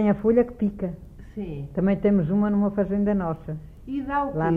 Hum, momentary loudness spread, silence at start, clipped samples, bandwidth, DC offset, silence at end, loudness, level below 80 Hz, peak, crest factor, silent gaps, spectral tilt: none; 15 LU; 0 s; under 0.1%; 3.5 kHz; under 0.1%; 0 s; -24 LUFS; -44 dBFS; -8 dBFS; 14 dB; none; -10.5 dB/octave